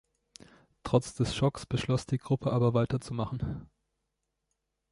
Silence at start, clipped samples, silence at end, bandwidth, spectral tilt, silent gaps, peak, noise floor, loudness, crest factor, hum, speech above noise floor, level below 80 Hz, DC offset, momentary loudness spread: 0.85 s; under 0.1%; 1.25 s; 11.5 kHz; -6.5 dB/octave; none; -10 dBFS; -83 dBFS; -30 LUFS; 20 dB; none; 53 dB; -52 dBFS; under 0.1%; 10 LU